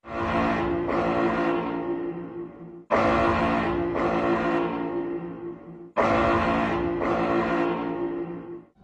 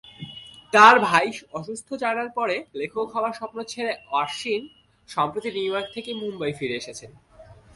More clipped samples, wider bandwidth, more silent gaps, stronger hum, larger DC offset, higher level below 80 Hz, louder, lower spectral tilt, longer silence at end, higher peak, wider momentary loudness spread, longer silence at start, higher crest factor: neither; second, 8.2 kHz vs 11.5 kHz; neither; neither; neither; first, -44 dBFS vs -64 dBFS; about the same, -25 LUFS vs -23 LUFS; first, -7.5 dB/octave vs -3.5 dB/octave; about the same, 0.2 s vs 0.2 s; second, -8 dBFS vs -2 dBFS; second, 15 LU vs 19 LU; second, 0.05 s vs 0.2 s; about the same, 18 dB vs 22 dB